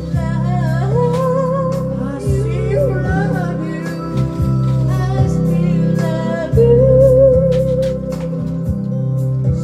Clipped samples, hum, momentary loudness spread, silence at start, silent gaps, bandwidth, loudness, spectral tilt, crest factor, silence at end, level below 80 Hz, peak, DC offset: under 0.1%; none; 10 LU; 0 s; none; 10 kHz; -16 LUFS; -9 dB/octave; 14 dB; 0 s; -30 dBFS; 0 dBFS; under 0.1%